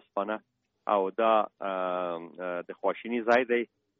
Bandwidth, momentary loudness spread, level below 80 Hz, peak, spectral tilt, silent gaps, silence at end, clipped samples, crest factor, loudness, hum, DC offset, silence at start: 7.2 kHz; 11 LU; -76 dBFS; -10 dBFS; -2.5 dB/octave; none; 0.35 s; under 0.1%; 20 dB; -29 LUFS; none; under 0.1%; 0.15 s